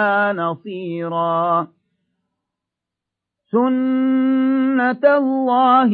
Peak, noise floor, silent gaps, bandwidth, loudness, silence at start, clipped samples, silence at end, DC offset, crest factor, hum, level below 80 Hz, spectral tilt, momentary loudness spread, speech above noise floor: -2 dBFS; -84 dBFS; none; 4.5 kHz; -18 LUFS; 0 s; under 0.1%; 0 s; under 0.1%; 16 dB; none; -76 dBFS; -9.5 dB/octave; 9 LU; 67 dB